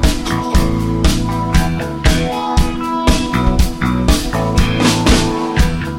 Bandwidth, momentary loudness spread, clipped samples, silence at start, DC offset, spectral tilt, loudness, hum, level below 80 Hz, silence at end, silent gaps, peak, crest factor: 16.5 kHz; 4 LU; under 0.1%; 0 s; under 0.1%; -5 dB/octave; -15 LUFS; none; -18 dBFS; 0 s; none; 0 dBFS; 14 dB